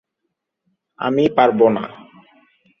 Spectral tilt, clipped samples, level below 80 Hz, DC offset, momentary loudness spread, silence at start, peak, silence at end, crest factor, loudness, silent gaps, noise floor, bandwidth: -8 dB/octave; under 0.1%; -62 dBFS; under 0.1%; 12 LU; 1 s; -2 dBFS; 0.85 s; 18 dB; -17 LUFS; none; -77 dBFS; 6.6 kHz